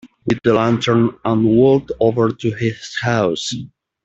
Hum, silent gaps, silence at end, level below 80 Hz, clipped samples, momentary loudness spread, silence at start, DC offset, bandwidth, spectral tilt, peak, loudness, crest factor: none; none; 0.4 s; -50 dBFS; under 0.1%; 9 LU; 0.05 s; under 0.1%; 8 kHz; -6.5 dB/octave; -2 dBFS; -17 LUFS; 14 dB